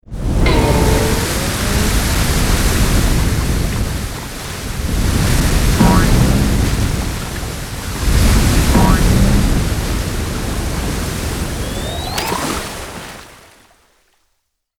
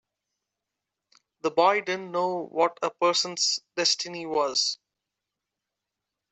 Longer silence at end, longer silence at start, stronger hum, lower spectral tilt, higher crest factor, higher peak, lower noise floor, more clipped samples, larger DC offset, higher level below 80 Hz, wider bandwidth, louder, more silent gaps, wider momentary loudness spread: about the same, 1.45 s vs 1.55 s; second, 0.1 s vs 1.45 s; neither; first, -5 dB/octave vs -1.5 dB/octave; second, 14 dB vs 22 dB; first, 0 dBFS vs -8 dBFS; second, -68 dBFS vs -86 dBFS; neither; neither; first, -18 dBFS vs -78 dBFS; first, 19 kHz vs 8.4 kHz; first, -16 LUFS vs -25 LUFS; neither; first, 11 LU vs 6 LU